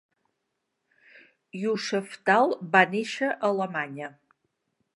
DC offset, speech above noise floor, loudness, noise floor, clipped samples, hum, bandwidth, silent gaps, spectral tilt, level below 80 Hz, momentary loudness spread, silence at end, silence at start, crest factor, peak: under 0.1%; 55 dB; -25 LUFS; -80 dBFS; under 0.1%; none; 11.5 kHz; none; -5 dB/octave; -82 dBFS; 15 LU; 0.85 s; 1.55 s; 24 dB; -4 dBFS